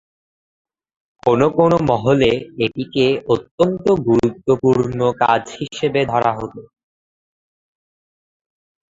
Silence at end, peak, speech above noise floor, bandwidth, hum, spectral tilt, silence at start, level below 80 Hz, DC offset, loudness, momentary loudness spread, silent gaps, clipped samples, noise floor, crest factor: 2.3 s; 0 dBFS; over 73 dB; 7.8 kHz; none; -7 dB/octave; 1.25 s; -48 dBFS; under 0.1%; -17 LUFS; 7 LU; 3.51-3.58 s; under 0.1%; under -90 dBFS; 18 dB